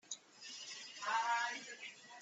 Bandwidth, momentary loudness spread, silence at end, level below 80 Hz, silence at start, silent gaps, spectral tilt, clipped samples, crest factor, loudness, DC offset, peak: 8.4 kHz; 14 LU; 0 s; under -90 dBFS; 0.05 s; none; 1 dB/octave; under 0.1%; 18 dB; -42 LUFS; under 0.1%; -26 dBFS